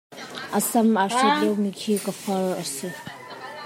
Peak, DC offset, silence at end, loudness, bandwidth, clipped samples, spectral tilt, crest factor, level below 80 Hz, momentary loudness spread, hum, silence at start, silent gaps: -8 dBFS; under 0.1%; 0 s; -23 LUFS; 16.5 kHz; under 0.1%; -4 dB/octave; 16 dB; -74 dBFS; 17 LU; none; 0.1 s; none